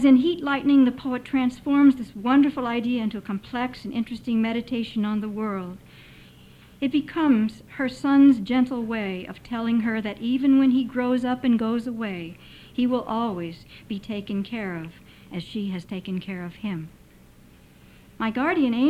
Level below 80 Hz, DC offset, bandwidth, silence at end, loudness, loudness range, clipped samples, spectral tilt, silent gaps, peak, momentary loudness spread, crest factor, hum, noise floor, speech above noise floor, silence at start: -56 dBFS; under 0.1%; 8.6 kHz; 0 s; -24 LUFS; 10 LU; under 0.1%; -7 dB/octave; none; -8 dBFS; 16 LU; 16 dB; none; -51 dBFS; 28 dB; 0 s